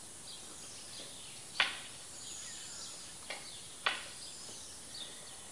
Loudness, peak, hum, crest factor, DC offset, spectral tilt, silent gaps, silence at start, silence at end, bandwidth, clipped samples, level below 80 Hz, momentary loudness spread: -41 LUFS; -12 dBFS; none; 30 dB; 0.1%; 0 dB/octave; none; 0 s; 0 s; 11.5 kHz; under 0.1%; -72 dBFS; 12 LU